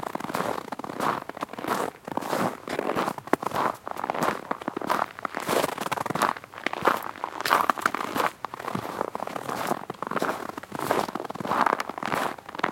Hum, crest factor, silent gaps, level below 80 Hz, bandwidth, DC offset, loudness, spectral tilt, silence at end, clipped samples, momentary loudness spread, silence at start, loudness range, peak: none; 28 dB; none; -68 dBFS; 17 kHz; under 0.1%; -28 LUFS; -4 dB/octave; 0 s; under 0.1%; 8 LU; 0 s; 3 LU; 0 dBFS